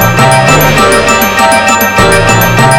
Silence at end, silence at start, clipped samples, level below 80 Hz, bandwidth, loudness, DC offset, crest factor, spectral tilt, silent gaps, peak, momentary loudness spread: 0 s; 0 s; 3%; -22 dBFS; over 20 kHz; -5 LUFS; under 0.1%; 6 dB; -4 dB/octave; none; 0 dBFS; 1 LU